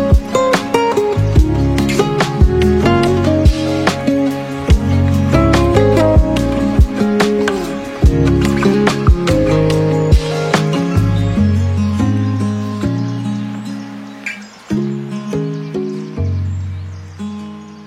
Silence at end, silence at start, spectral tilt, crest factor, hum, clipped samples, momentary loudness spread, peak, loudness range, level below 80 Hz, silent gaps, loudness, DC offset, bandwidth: 0 s; 0 s; -7 dB/octave; 14 dB; none; under 0.1%; 13 LU; 0 dBFS; 9 LU; -20 dBFS; none; -14 LUFS; under 0.1%; 15 kHz